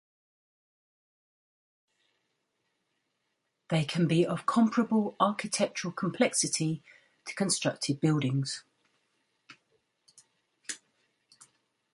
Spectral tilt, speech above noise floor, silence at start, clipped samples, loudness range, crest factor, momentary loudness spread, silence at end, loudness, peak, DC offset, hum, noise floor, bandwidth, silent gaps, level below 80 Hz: -4.5 dB/octave; 52 dB; 3.7 s; under 0.1%; 12 LU; 22 dB; 15 LU; 1.2 s; -29 LUFS; -10 dBFS; under 0.1%; none; -80 dBFS; 11.5 kHz; none; -74 dBFS